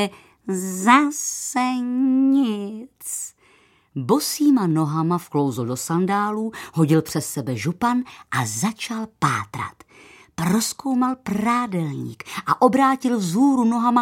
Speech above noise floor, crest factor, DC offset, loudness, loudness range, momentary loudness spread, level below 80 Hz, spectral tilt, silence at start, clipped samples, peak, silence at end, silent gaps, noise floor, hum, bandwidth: 36 dB; 20 dB; under 0.1%; -21 LUFS; 4 LU; 12 LU; -62 dBFS; -5 dB/octave; 0 s; under 0.1%; 0 dBFS; 0 s; none; -57 dBFS; none; 16.5 kHz